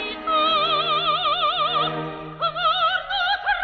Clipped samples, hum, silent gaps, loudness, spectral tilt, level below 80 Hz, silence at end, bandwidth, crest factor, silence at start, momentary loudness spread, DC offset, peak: under 0.1%; none; none; -21 LUFS; -5 dB/octave; -54 dBFS; 0 s; 6.2 kHz; 12 dB; 0 s; 7 LU; under 0.1%; -10 dBFS